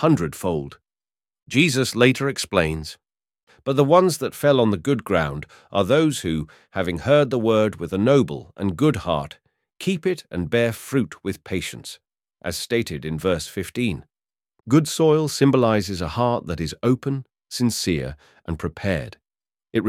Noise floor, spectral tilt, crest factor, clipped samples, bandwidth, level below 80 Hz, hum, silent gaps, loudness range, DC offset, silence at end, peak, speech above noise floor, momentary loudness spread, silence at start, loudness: under -90 dBFS; -5.5 dB/octave; 20 dB; under 0.1%; 16.5 kHz; -46 dBFS; none; 3.43-3.47 s; 6 LU; under 0.1%; 0 s; -2 dBFS; over 69 dB; 13 LU; 0 s; -22 LUFS